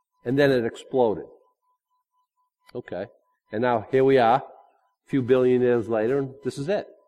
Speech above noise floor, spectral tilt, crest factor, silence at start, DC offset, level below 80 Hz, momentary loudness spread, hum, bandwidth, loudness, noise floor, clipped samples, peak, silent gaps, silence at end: 51 dB; -7 dB/octave; 18 dB; 0.25 s; under 0.1%; -62 dBFS; 16 LU; none; 12 kHz; -23 LUFS; -73 dBFS; under 0.1%; -6 dBFS; none; 0.25 s